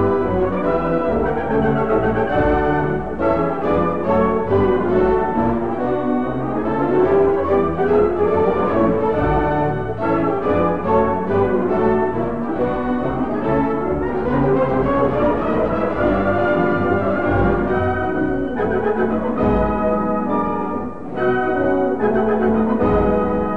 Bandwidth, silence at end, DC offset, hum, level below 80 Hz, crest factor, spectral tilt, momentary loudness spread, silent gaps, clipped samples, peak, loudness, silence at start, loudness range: 5.4 kHz; 0 s; 2%; none; -34 dBFS; 14 dB; -9.5 dB/octave; 4 LU; none; under 0.1%; -4 dBFS; -18 LUFS; 0 s; 2 LU